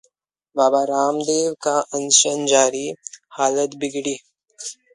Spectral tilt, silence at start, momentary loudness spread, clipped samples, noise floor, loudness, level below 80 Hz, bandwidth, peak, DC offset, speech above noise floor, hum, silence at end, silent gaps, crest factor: -1.5 dB/octave; 0.55 s; 19 LU; under 0.1%; -69 dBFS; -19 LUFS; -70 dBFS; 11.5 kHz; 0 dBFS; under 0.1%; 50 dB; none; 0.2 s; none; 20 dB